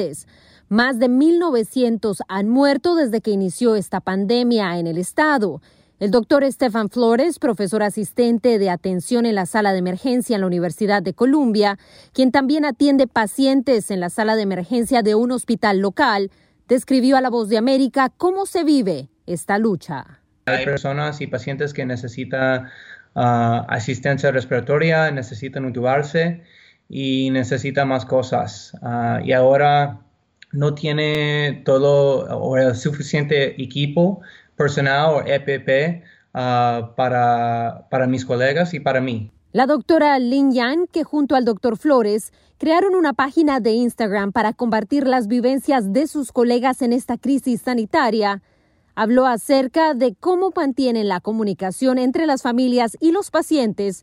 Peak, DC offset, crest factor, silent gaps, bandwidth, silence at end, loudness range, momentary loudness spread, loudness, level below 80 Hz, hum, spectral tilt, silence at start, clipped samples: -4 dBFS; under 0.1%; 14 dB; none; 16 kHz; 0.05 s; 3 LU; 8 LU; -19 LUFS; -58 dBFS; none; -6 dB/octave; 0 s; under 0.1%